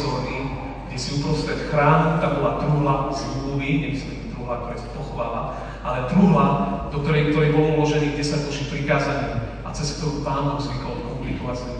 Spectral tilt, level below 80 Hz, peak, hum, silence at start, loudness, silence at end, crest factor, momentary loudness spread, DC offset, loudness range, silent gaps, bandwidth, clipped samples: -6.5 dB/octave; -36 dBFS; -4 dBFS; none; 0 s; -23 LUFS; 0 s; 18 dB; 12 LU; under 0.1%; 5 LU; none; 9.6 kHz; under 0.1%